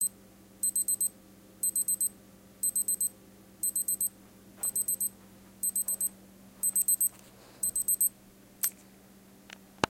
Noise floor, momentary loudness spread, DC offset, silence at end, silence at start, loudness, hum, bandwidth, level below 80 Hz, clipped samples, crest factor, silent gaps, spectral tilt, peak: -56 dBFS; 7 LU; under 0.1%; 0.05 s; 0 s; -29 LUFS; none; 17 kHz; -66 dBFS; under 0.1%; 30 dB; none; -0.5 dB/octave; -4 dBFS